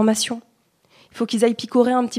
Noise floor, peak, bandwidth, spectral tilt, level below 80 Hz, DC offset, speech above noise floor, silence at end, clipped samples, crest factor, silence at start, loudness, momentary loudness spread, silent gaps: -59 dBFS; -4 dBFS; 14.5 kHz; -4 dB/octave; -70 dBFS; under 0.1%; 40 dB; 0 s; under 0.1%; 18 dB; 0 s; -20 LUFS; 10 LU; none